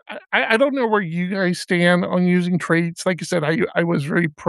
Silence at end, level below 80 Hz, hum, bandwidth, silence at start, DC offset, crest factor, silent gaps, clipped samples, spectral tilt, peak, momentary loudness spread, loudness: 0 s; -68 dBFS; none; 12 kHz; 0.1 s; under 0.1%; 18 dB; none; under 0.1%; -6 dB/octave; -2 dBFS; 5 LU; -19 LUFS